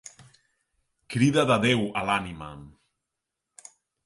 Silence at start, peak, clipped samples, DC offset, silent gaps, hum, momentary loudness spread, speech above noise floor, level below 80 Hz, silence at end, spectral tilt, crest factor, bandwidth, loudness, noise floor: 1.1 s; -8 dBFS; under 0.1%; under 0.1%; none; none; 20 LU; 60 dB; -58 dBFS; 1.35 s; -5.5 dB/octave; 20 dB; 11.5 kHz; -24 LUFS; -85 dBFS